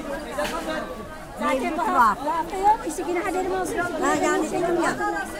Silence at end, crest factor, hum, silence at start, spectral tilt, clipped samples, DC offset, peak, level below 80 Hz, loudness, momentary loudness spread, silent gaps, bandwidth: 0 s; 18 dB; none; 0 s; -4 dB/octave; under 0.1%; under 0.1%; -6 dBFS; -46 dBFS; -24 LUFS; 10 LU; none; 16 kHz